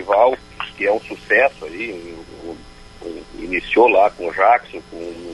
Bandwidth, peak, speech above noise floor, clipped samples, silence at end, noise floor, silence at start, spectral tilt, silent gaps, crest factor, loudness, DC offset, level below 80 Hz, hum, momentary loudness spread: 11.5 kHz; -2 dBFS; 22 dB; under 0.1%; 0 s; -39 dBFS; 0 s; -5 dB/octave; none; 18 dB; -17 LUFS; under 0.1%; -46 dBFS; none; 21 LU